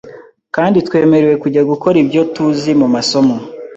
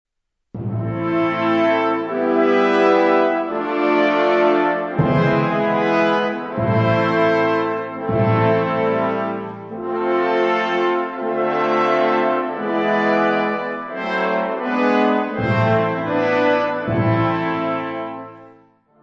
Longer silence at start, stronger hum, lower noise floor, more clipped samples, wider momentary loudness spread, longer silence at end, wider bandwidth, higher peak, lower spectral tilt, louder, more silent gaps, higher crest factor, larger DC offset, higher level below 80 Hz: second, 0.05 s vs 0.55 s; neither; second, -36 dBFS vs -52 dBFS; neither; second, 4 LU vs 8 LU; second, 0 s vs 0.55 s; first, 8.2 kHz vs 7.4 kHz; about the same, 0 dBFS vs -2 dBFS; second, -6 dB/octave vs -8 dB/octave; first, -12 LUFS vs -18 LUFS; neither; about the same, 12 dB vs 16 dB; neither; about the same, -52 dBFS vs -54 dBFS